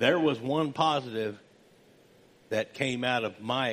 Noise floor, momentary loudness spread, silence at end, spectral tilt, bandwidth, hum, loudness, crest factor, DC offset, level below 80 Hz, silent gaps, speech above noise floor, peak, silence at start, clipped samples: -59 dBFS; 8 LU; 0 s; -5 dB/octave; 15 kHz; none; -29 LUFS; 20 dB; under 0.1%; -72 dBFS; none; 31 dB; -10 dBFS; 0 s; under 0.1%